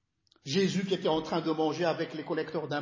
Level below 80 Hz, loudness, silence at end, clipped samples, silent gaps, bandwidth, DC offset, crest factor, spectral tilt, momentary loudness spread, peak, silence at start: -68 dBFS; -31 LUFS; 0 s; under 0.1%; none; 7.6 kHz; under 0.1%; 16 dB; -5.5 dB/octave; 6 LU; -14 dBFS; 0.45 s